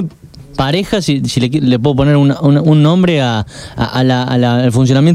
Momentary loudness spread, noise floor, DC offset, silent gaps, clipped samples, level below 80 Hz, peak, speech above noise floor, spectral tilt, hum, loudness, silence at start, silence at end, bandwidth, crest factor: 9 LU; -34 dBFS; under 0.1%; none; under 0.1%; -36 dBFS; 0 dBFS; 23 dB; -7 dB/octave; none; -12 LUFS; 0 s; 0 s; 13 kHz; 10 dB